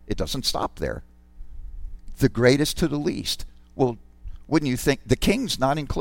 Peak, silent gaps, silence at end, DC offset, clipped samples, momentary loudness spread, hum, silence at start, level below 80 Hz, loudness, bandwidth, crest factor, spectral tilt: -4 dBFS; none; 0 s; under 0.1%; under 0.1%; 22 LU; none; 0.05 s; -36 dBFS; -24 LUFS; 17 kHz; 20 dB; -5 dB/octave